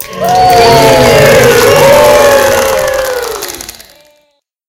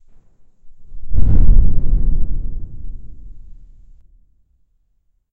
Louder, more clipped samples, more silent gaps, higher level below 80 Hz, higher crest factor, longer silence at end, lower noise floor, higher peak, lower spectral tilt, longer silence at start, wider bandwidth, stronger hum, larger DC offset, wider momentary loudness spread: first, -5 LUFS vs -20 LUFS; first, 5% vs 0.3%; neither; second, -30 dBFS vs -16 dBFS; second, 6 dB vs 14 dB; second, 0.95 s vs 1.7 s; second, -56 dBFS vs -62 dBFS; about the same, 0 dBFS vs 0 dBFS; second, -3.5 dB/octave vs -12 dB/octave; second, 0 s vs 0.4 s; first, over 20 kHz vs 0.9 kHz; neither; neither; second, 14 LU vs 26 LU